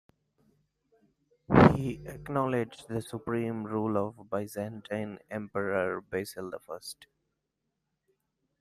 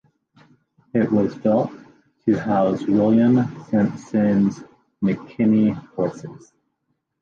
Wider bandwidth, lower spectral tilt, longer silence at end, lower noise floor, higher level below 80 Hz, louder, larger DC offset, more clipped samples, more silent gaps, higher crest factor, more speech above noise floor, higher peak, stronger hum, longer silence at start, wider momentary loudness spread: first, 15 kHz vs 7 kHz; second, -7 dB/octave vs -9 dB/octave; first, 1.55 s vs 0.85 s; first, -83 dBFS vs -74 dBFS; about the same, -54 dBFS vs -58 dBFS; second, -30 LUFS vs -20 LUFS; neither; neither; neither; first, 28 dB vs 14 dB; second, 49 dB vs 55 dB; about the same, -4 dBFS vs -6 dBFS; neither; first, 1.5 s vs 0.95 s; first, 18 LU vs 9 LU